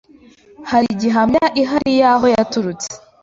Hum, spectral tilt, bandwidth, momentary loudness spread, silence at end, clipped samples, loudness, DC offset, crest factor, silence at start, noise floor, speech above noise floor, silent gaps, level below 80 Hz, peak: none; -4.5 dB/octave; 7.8 kHz; 13 LU; 0.25 s; under 0.1%; -15 LUFS; under 0.1%; 14 dB; 0.6 s; -46 dBFS; 31 dB; none; -50 dBFS; -2 dBFS